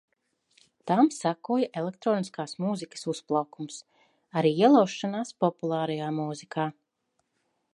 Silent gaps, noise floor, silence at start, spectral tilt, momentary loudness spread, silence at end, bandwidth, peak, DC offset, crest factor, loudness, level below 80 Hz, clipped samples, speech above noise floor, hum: none; -77 dBFS; 0.85 s; -6 dB/octave; 13 LU; 1 s; 11.5 kHz; -8 dBFS; under 0.1%; 20 dB; -27 LUFS; -80 dBFS; under 0.1%; 51 dB; none